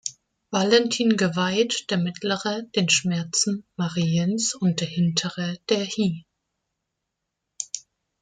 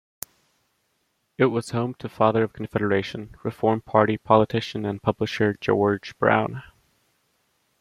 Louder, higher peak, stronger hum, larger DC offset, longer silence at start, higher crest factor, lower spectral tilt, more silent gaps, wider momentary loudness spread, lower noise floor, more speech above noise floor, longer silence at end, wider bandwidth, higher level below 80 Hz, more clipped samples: about the same, -23 LUFS vs -23 LUFS; about the same, -4 dBFS vs -2 dBFS; neither; neither; second, 0.05 s vs 1.4 s; about the same, 20 dB vs 22 dB; second, -4 dB/octave vs -6.5 dB/octave; neither; second, 11 LU vs 14 LU; first, -82 dBFS vs -72 dBFS; first, 58 dB vs 49 dB; second, 0.4 s vs 1.2 s; second, 9.6 kHz vs 16.5 kHz; second, -66 dBFS vs -58 dBFS; neither